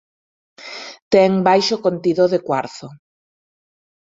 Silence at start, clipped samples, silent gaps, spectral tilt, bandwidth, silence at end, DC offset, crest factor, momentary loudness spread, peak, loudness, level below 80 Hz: 0.6 s; under 0.1%; 1.02-1.11 s; -5.5 dB/octave; 7.8 kHz; 1.2 s; under 0.1%; 18 dB; 19 LU; -2 dBFS; -17 LUFS; -62 dBFS